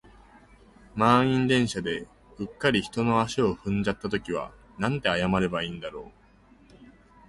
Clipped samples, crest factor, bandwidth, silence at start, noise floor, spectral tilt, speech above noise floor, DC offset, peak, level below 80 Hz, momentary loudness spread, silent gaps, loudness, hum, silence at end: under 0.1%; 22 dB; 11.5 kHz; 0.95 s; -56 dBFS; -5.5 dB/octave; 31 dB; under 0.1%; -6 dBFS; -52 dBFS; 17 LU; none; -26 LUFS; none; 0.4 s